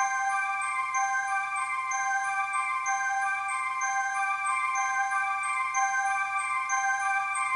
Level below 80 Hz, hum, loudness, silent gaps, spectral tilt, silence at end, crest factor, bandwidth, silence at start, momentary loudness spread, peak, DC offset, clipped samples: -76 dBFS; none; -28 LUFS; none; 2.5 dB/octave; 0 s; 14 dB; 11.5 kHz; 0 s; 2 LU; -14 dBFS; under 0.1%; under 0.1%